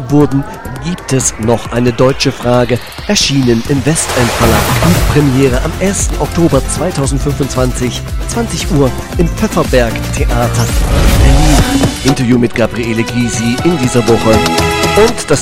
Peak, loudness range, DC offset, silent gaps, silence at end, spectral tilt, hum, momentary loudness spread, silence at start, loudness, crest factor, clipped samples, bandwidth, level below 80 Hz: 0 dBFS; 3 LU; under 0.1%; none; 0 s; -5 dB/octave; none; 6 LU; 0 s; -11 LUFS; 10 dB; 0.1%; 16.5 kHz; -18 dBFS